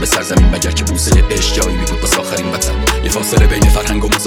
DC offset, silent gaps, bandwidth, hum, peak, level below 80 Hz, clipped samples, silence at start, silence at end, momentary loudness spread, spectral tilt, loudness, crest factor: under 0.1%; none; 19.5 kHz; none; 0 dBFS; -14 dBFS; under 0.1%; 0 s; 0 s; 5 LU; -4 dB/octave; -13 LUFS; 12 dB